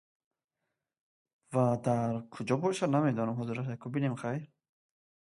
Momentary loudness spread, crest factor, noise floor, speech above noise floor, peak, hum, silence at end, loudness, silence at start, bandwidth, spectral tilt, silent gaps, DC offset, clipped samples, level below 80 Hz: 8 LU; 18 dB; -87 dBFS; 56 dB; -14 dBFS; none; 0.75 s; -32 LUFS; 1.5 s; 11.5 kHz; -7.5 dB/octave; none; under 0.1%; under 0.1%; -72 dBFS